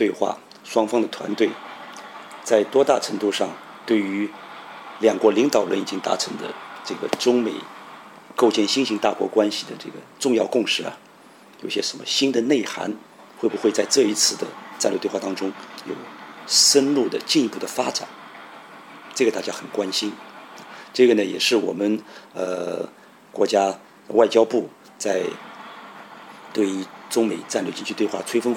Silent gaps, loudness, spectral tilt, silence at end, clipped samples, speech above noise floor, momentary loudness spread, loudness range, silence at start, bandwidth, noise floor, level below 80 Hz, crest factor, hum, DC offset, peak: none; -22 LUFS; -2.5 dB/octave; 0 s; under 0.1%; 27 dB; 20 LU; 4 LU; 0 s; 17.5 kHz; -48 dBFS; -74 dBFS; 20 dB; none; under 0.1%; -4 dBFS